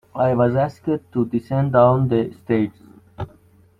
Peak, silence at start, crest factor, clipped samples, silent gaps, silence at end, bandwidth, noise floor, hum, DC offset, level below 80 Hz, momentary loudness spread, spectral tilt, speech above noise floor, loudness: -2 dBFS; 0.15 s; 18 dB; under 0.1%; none; 0.5 s; 5.8 kHz; -52 dBFS; none; under 0.1%; -52 dBFS; 19 LU; -10 dB/octave; 34 dB; -20 LUFS